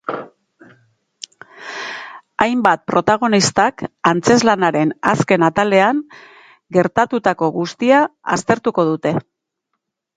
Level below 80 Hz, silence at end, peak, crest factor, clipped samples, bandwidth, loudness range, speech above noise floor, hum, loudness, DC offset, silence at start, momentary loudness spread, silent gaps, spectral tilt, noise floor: -56 dBFS; 0.95 s; 0 dBFS; 18 dB; under 0.1%; 9.6 kHz; 3 LU; 60 dB; none; -16 LUFS; under 0.1%; 0.1 s; 17 LU; none; -4.5 dB/octave; -75 dBFS